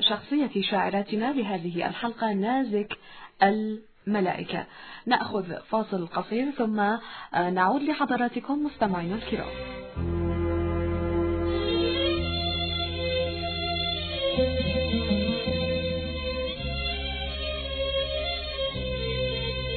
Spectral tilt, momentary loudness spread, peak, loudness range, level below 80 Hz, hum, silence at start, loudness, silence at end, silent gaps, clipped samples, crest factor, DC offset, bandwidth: -9 dB/octave; 6 LU; -8 dBFS; 2 LU; -42 dBFS; none; 0 s; -28 LUFS; 0 s; none; under 0.1%; 20 dB; under 0.1%; 4.6 kHz